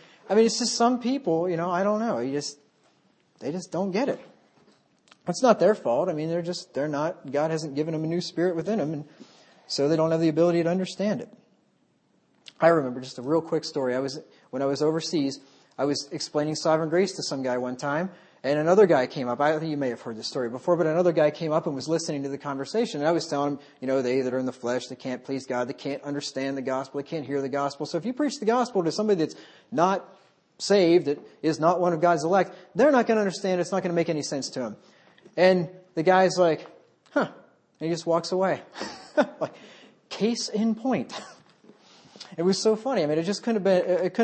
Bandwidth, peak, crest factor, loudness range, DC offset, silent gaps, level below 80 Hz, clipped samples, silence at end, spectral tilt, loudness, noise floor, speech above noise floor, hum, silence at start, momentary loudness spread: 8.8 kHz; -4 dBFS; 22 dB; 5 LU; under 0.1%; none; -76 dBFS; under 0.1%; 0 s; -5 dB/octave; -26 LUFS; -67 dBFS; 42 dB; none; 0.25 s; 12 LU